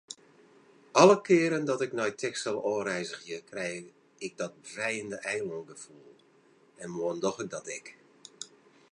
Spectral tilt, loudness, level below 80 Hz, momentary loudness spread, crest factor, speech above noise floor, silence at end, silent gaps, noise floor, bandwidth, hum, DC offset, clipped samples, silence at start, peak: -4.5 dB/octave; -29 LUFS; -78 dBFS; 23 LU; 24 dB; 33 dB; 0.45 s; none; -63 dBFS; 11 kHz; none; under 0.1%; under 0.1%; 0.1 s; -6 dBFS